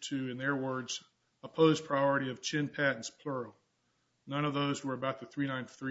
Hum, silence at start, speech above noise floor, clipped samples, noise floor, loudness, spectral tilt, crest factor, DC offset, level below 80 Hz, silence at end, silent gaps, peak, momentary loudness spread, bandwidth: none; 0 s; 44 dB; under 0.1%; -77 dBFS; -33 LUFS; -4 dB/octave; 22 dB; under 0.1%; -76 dBFS; 0 s; none; -12 dBFS; 12 LU; 7.6 kHz